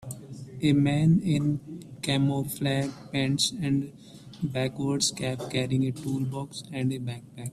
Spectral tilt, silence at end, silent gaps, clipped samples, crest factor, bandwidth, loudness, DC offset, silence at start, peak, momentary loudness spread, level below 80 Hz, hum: -5 dB/octave; 0 s; none; under 0.1%; 16 dB; 15 kHz; -27 LUFS; under 0.1%; 0 s; -12 dBFS; 14 LU; -58 dBFS; none